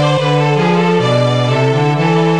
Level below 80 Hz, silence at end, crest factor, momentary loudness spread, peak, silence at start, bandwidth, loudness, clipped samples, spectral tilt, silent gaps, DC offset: -60 dBFS; 0 s; 12 dB; 1 LU; 0 dBFS; 0 s; 10 kHz; -13 LUFS; under 0.1%; -6.5 dB/octave; none; 0.8%